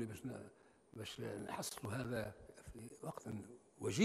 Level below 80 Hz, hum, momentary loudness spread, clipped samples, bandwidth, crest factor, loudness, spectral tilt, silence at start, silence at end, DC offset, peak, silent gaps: -70 dBFS; none; 15 LU; under 0.1%; 15 kHz; 22 dB; -47 LUFS; -5 dB/octave; 0 s; 0 s; under 0.1%; -22 dBFS; none